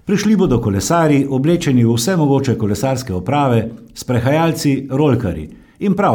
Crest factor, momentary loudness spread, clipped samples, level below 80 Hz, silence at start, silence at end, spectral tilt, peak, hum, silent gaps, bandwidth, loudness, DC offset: 12 dB; 7 LU; under 0.1%; -40 dBFS; 0.05 s; 0 s; -6.5 dB/octave; -2 dBFS; none; none; 18.5 kHz; -16 LUFS; under 0.1%